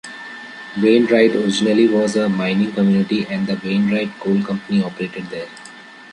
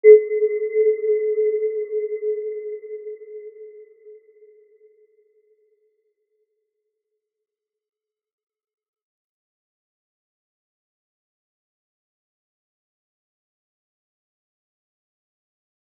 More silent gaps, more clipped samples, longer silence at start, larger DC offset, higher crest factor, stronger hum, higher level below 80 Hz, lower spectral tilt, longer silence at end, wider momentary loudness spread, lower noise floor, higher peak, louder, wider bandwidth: neither; neither; about the same, 0.05 s vs 0.05 s; neither; second, 16 dB vs 24 dB; neither; first, -60 dBFS vs under -90 dBFS; second, -6 dB/octave vs -8.5 dB/octave; second, 0 s vs 11.85 s; about the same, 18 LU vs 20 LU; second, -39 dBFS vs -85 dBFS; about the same, -2 dBFS vs -2 dBFS; first, -17 LUFS vs -21 LUFS; first, 10.5 kHz vs 2.2 kHz